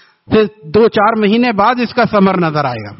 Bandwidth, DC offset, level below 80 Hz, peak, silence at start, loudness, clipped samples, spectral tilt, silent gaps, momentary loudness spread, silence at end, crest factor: 6 kHz; under 0.1%; -46 dBFS; 0 dBFS; 0.3 s; -12 LUFS; under 0.1%; -5 dB/octave; none; 4 LU; 0.05 s; 12 dB